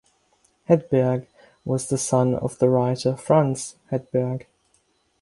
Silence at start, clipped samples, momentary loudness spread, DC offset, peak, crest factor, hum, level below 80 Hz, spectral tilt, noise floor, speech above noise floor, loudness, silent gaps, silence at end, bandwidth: 0.7 s; under 0.1%; 11 LU; under 0.1%; -4 dBFS; 20 dB; none; -58 dBFS; -6.5 dB/octave; -66 dBFS; 44 dB; -22 LUFS; none; 0.8 s; 11.5 kHz